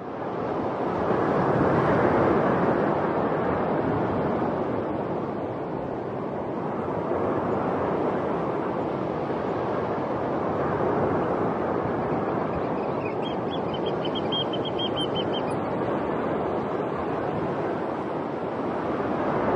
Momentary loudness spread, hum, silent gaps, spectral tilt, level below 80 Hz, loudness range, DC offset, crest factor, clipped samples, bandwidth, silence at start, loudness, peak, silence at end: 7 LU; none; none; -8 dB/octave; -54 dBFS; 5 LU; under 0.1%; 16 dB; under 0.1%; 10.5 kHz; 0 s; -26 LUFS; -10 dBFS; 0 s